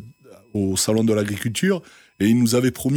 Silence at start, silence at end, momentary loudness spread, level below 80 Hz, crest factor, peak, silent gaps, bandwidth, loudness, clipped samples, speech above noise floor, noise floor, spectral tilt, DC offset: 0 s; 0 s; 8 LU; -56 dBFS; 14 dB; -8 dBFS; none; 18 kHz; -21 LUFS; under 0.1%; 27 dB; -46 dBFS; -5 dB/octave; under 0.1%